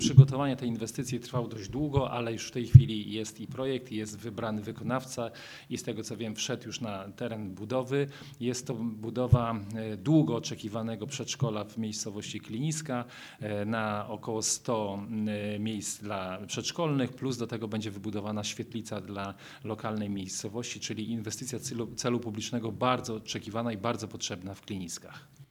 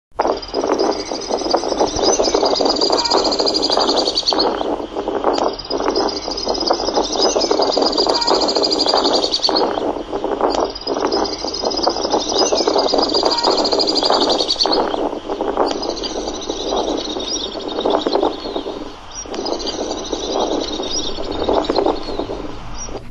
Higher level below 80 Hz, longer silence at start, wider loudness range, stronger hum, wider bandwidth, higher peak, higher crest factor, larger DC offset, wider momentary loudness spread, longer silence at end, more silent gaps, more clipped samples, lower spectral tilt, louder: second, -52 dBFS vs -38 dBFS; about the same, 0 s vs 0.1 s; about the same, 8 LU vs 6 LU; neither; first, 14.5 kHz vs 10 kHz; about the same, -2 dBFS vs -2 dBFS; first, 30 dB vs 16 dB; neither; about the same, 11 LU vs 9 LU; about the same, 0.05 s vs 0 s; neither; neither; first, -5.5 dB/octave vs -2.5 dB/octave; second, -32 LUFS vs -17 LUFS